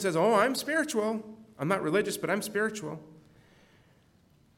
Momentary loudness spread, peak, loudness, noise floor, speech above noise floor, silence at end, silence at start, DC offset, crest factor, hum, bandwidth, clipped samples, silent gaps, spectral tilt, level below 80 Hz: 15 LU; -12 dBFS; -29 LUFS; -63 dBFS; 35 dB; 1.45 s; 0 s; under 0.1%; 20 dB; none; 17 kHz; under 0.1%; none; -4.5 dB/octave; -72 dBFS